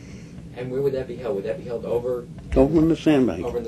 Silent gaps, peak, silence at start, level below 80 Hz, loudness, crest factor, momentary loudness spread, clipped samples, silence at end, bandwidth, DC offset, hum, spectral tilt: none; -4 dBFS; 0 s; -38 dBFS; -23 LUFS; 18 dB; 15 LU; under 0.1%; 0 s; 13 kHz; under 0.1%; none; -8 dB/octave